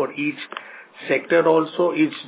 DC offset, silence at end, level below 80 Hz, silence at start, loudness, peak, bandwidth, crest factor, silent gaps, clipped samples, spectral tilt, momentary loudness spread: under 0.1%; 0 s; -78 dBFS; 0 s; -20 LUFS; -4 dBFS; 4 kHz; 16 dB; none; under 0.1%; -9.5 dB/octave; 19 LU